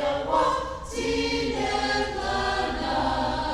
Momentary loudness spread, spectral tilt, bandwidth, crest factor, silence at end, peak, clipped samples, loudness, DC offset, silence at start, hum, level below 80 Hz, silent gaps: 4 LU; -4 dB/octave; 13.5 kHz; 14 dB; 0 s; -12 dBFS; under 0.1%; -26 LUFS; under 0.1%; 0 s; none; -40 dBFS; none